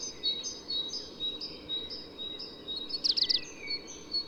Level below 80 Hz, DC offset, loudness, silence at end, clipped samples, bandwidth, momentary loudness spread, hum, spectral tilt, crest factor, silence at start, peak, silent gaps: -64 dBFS; under 0.1%; -32 LUFS; 0 s; under 0.1%; 19 kHz; 12 LU; none; -0.5 dB/octave; 20 dB; 0 s; -16 dBFS; none